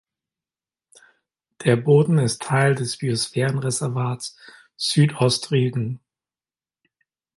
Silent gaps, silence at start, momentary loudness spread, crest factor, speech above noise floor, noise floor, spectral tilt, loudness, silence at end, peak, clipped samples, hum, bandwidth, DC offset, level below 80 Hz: none; 1.6 s; 11 LU; 20 dB; over 70 dB; under -90 dBFS; -5.5 dB/octave; -21 LUFS; 1.4 s; -4 dBFS; under 0.1%; none; 11.5 kHz; under 0.1%; -62 dBFS